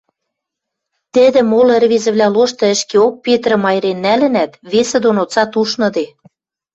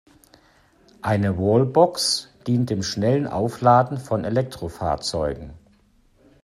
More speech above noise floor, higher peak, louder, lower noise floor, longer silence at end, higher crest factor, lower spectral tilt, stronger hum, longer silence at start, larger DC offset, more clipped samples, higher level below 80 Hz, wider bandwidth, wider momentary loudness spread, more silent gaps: first, 66 dB vs 37 dB; about the same, -2 dBFS vs -2 dBFS; first, -13 LUFS vs -22 LUFS; first, -79 dBFS vs -58 dBFS; second, 0.7 s vs 0.85 s; second, 12 dB vs 20 dB; second, -4 dB/octave vs -5.5 dB/octave; neither; about the same, 1.15 s vs 1.05 s; neither; neither; second, -58 dBFS vs -48 dBFS; second, 8.2 kHz vs 14.5 kHz; second, 6 LU vs 11 LU; neither